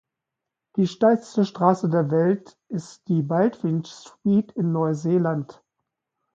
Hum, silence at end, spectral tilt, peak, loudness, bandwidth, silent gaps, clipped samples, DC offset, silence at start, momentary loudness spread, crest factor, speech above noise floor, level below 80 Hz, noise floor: none; 0.85 s; -8 dB/octave; -4 dBFS; -23 LUFS; 7.8 kHz; none; under 0.1%; under 0.1%; 0.75 s; 13 LU; 18 dB; 63 dB; -68 dBFS; -85 dBFS